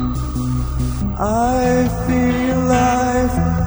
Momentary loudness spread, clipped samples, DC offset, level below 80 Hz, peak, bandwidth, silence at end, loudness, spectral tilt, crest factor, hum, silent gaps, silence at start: 6 LU; under 0.1%; under 0.1%; -26 dBFS; -4 dBFS; over 20 kHz; 0 s; -17 LUFS; -6.5 dB/octave; 12 dB; none; none; 0 s